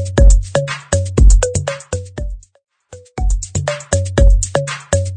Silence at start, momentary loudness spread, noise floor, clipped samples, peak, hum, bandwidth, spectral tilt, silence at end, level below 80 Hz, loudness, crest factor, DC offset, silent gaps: 0 s; 15 LU; -41 dBFS; 0.2%; 0 dBFS; none; 9.4 kHz; -5 dB/octave; 0 s; -14 dBFS; -16 LUFS; 14 dB; under 0.1%; none